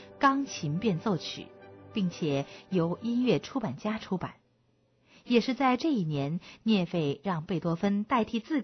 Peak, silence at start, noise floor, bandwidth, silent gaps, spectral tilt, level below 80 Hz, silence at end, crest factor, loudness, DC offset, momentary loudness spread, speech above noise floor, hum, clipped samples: -12 dBFS; 0 s; -69 dBFS; 6.4 kHz; none; -6.5 dB/octave; -64 dBFS; 0 s; 18 dB; -30 LUFS; under 0.1%; 8 LU; 40 dB; none; under 0.1%